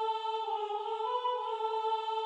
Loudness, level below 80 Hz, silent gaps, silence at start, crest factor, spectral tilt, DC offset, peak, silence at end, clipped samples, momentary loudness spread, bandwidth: -34 LUFS; under -90 dBFS; none; 0 s; 12 dB; 0.5 dB/octave; under 0.1%; -22 dBFS; 0 s; under 0.1%; 2 LU; 8.8 kHz